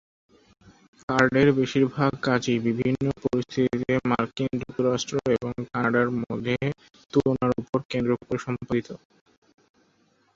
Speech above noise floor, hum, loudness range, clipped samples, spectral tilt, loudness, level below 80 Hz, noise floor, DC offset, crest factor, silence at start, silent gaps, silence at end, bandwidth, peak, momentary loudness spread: 41 dB; none; 4 LU; under 0.1%; -6.5 dB/octave; -25 LUFS; -54 dBFS; -65 dBFS; under 0.1%; 22 dB; 1.1 s; 7.69-7.73 s, 7.85-7.89 s; 1.4 s; 7.8 kHz; -4 dBFS; 8 LU